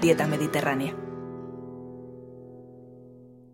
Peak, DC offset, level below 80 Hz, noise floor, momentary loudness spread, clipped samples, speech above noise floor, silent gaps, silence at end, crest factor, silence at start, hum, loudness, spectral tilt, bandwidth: -8 dBFS; under 0.1%; -64 dBFS; -50 dBFS; 24 LU; under 0.1%; 25 dB; none; 0.1 s; 22 dB; 0 s; none; -28 LUFS; -5.5 dB/octave; 16.5 kHz